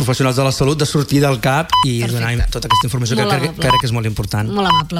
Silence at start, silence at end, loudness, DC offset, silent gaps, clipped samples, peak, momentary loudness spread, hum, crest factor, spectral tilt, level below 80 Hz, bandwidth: 0 s; 0 s; -16 LUFS; under 0.1%; none; under 0.1%; -2 dBFS; 5 LU; none; 14 dB; -5 dB/octave; -30 dBFS; 16.5 kHz